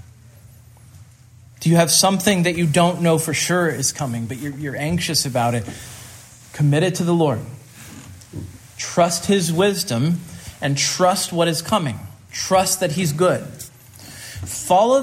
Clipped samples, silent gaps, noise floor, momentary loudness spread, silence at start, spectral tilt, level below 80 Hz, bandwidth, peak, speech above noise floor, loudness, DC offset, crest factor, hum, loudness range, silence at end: under 0.1%; none; -46 dBFS; 20 LU; 0.45 s; -4 dB/octave; -54 dBFS; 16 kHz; -2 dBFS; 28 dB; -19 LUFS; under 0.1%; 20 dB; none; 5 LU; 0 s